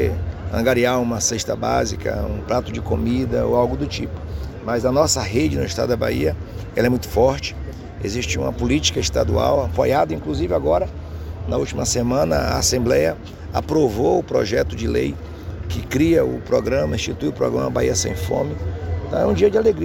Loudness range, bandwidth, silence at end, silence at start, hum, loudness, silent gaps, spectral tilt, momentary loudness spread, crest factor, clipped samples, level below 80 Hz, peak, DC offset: 2 LU; 17 kHz; 0 s; 0 s; none; -20 LUFS; none; -5 dB/octave; 10 LU; 18 dB; under 0.1%; -32 dBFS; -2 dBFS; under 0.1%